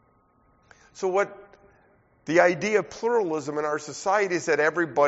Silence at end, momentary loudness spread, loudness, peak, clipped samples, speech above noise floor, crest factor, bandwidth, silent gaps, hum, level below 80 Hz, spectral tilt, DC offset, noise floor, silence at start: 0 s; 9 LU; -25 LUFS; -4 dBFS; under 0.1%; 39 dB; 22 dB; 8 kHz; none; none; -68 dBFS; -3.5 dB/octave; under 0.1%; -63 dBFS; 0.95 s